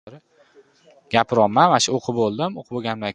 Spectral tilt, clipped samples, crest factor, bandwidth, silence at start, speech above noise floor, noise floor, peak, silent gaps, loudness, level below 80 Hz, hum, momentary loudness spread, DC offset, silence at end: -4 dB/octave; under 0.1%; 22 dB; 11 kHz; 0.05 s; 34 dB; -54 dBFS; 0 dBFS; none; -20 LUFS; -60 dBFS; none; 11 LU; under 0.1%; 0 s